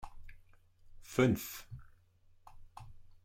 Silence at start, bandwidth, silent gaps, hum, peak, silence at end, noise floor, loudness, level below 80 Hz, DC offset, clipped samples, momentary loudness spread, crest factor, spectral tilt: 0 s; 16.5 kHz; none; none; -16 dBFS; 0.1 s; -65 dBFS; -34 LUFS; -56 dBFS; under 0.1%; under 0.1%; 25 LU; 22 dB; -6 dB/octave